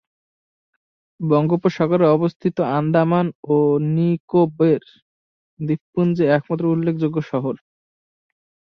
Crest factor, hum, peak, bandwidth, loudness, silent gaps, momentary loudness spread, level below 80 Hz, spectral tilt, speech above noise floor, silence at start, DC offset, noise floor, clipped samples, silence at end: 16 dB; none; -4 dBFS; 6.2 kHz; -19 LUFS; 2.36-2.40 s, 3.35-3.43 s, 4.20-4.28 s, 5.02-5.57 s, 5.81-5.93 s; 8 LU; -62 dBFS; -9.5 dB/octave; over 72 dB; 1.2 s; under 0.1%; under -90 dBFS; under 0.1%; 1.2 s